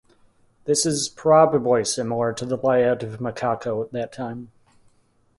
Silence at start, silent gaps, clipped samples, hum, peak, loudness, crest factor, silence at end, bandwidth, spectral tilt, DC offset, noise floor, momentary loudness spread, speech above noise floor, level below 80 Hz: 0.65 s; none; under 0.1%; none; -2 dBFS; -22 LUFS; 20 dB; 0.95 s; 11.5 kHz; -4.5 dB/octave; under 0.1%; -62 dBFS; 14 LU; 41 dB; -60 dBFS